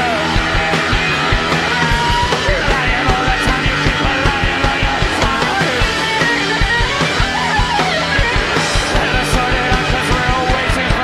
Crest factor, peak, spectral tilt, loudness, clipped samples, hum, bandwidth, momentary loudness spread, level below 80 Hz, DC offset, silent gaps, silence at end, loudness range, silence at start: 14 dB; 0 dBFS; -4 dB/octave; -14 LUFS; under 0.1%; none; 14.5 kHz; 1 LU; -22 dBFS; under 0.1%; none; 0 s; 0 LU; 0 s